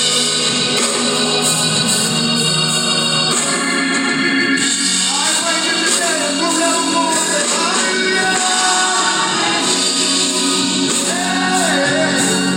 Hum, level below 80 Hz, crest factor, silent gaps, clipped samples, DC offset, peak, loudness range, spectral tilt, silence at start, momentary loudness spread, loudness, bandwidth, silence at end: none; -60 dBFS; 14 dB; none; under 0.1%; under 0.1%; -2 dBFS; 0 LU; -1.5 dB/octave; 0 s; 2 LU; -14 LUFS; 17 kHz; 0 s